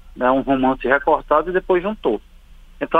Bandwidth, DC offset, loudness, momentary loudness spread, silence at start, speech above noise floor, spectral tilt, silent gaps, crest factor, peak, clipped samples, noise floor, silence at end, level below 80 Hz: 4.7 kHz; under 0.1%; -19 LUFS; 6 LU; 0.05 s; 25 dB; -7.5 dB/octave; none; 18 dB; -2 dBFS; under 0.1%; -43 dBFS; 0 s; -40 dBFS